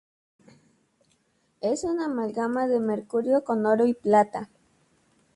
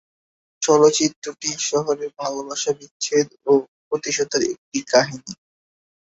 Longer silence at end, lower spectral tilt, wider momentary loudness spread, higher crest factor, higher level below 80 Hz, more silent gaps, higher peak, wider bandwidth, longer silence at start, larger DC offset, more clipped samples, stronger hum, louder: first, 0.9 s vs 0.75 s; first, -6 dB/octave vs -3 dB/octave; second, 8 LU vs 12 LU; about the same, 18 dB vs 20 dB; about the same, -68 dBFS vs -64 dBFS; second, none vs 1.16-1.22 s, 2.91-3.00 s, 3.68-3.91 s, 4.58-4.72 s; second, -8 dBFS vs -2 dBFS; first, 11.5 kHz vs 8 kHz; first, 1.65 s vs 0.6 s; neither; neither; neither; second, -25 LUFS vs -21 LUFS